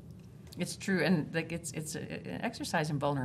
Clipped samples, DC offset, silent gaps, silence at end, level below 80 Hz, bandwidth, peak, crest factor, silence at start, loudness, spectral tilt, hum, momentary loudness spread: under 0.1%; under 0.1%; none; 0 s; -64 dBFS; 15 kHz; -16 dBFS; 18 dB; 0 s; -34 LUFS; -5 dB/octave; none; 13 LU